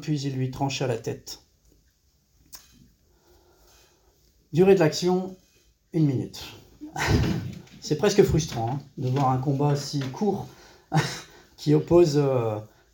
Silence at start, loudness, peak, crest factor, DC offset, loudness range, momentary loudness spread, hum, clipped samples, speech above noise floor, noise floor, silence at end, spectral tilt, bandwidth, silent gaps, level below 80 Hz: 0 s; -24 LUFS; -6 dBFS; 20 dB; under 0.1%; 9 LU; 20 LU; none; under 0.1%; 42 dB; -65 dBFS; 0.25 s; -6.5 dB/octave; 17 kHz; none; -44 dBFS